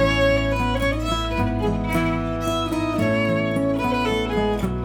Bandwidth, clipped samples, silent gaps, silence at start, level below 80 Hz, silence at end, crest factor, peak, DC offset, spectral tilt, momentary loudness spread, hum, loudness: 18.5 kHz; under 0.1%; none; 0 s; -32 dBFS; 0 s; 14 dB; -8 dBFS; under 0.1%; -6 dB/octave; 4 LU; none; -22 LUFS